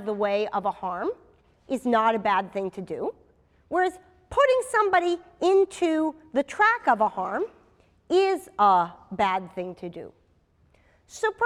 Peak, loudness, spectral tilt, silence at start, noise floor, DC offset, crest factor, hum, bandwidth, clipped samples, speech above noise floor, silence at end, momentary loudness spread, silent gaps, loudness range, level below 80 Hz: -8 dBFS; -25 LUFS; -4.5 dB/octave; 0 s; -63 dBFS; under 0.1%; 18 dB; none; 13 kHz; under 0.1%; 39 dB; 0 s; 13 LU; none; 4 LU; -60 dBFS